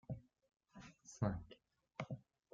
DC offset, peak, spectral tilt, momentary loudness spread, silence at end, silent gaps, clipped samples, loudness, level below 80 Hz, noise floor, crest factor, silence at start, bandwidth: under 0.1%; -26 dBFS; -7.5 dB/octave; 20 LU; 0.35 s; none; under 0.1%; -48 LUFS; -66 dBFS; -68 dBFS; 22 dB; 0.1 s; 7.4 kHz